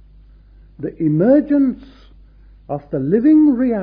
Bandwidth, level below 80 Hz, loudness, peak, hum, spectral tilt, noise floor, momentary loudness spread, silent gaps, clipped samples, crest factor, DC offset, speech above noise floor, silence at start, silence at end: 3.9 kHz; -46 dBFS; -15 LUFS; -2 dBFS; none; -12.5 dB/octave; -45 dBFS; 17 LU; none; under 0.1%; 14 dB; under 0.1%; 30 dB; 0.8 s; 0 s